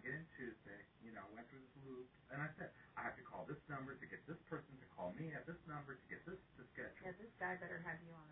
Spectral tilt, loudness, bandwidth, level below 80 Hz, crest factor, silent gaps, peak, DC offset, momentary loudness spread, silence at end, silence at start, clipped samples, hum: -2.5 dB/octave; -52 LUFS; 3.8 kHz; -76 dBFS; 20 dB; none; -34 dBFS; under 0.1%; 10 LU; 0 s; 0 s; under 0.1%; none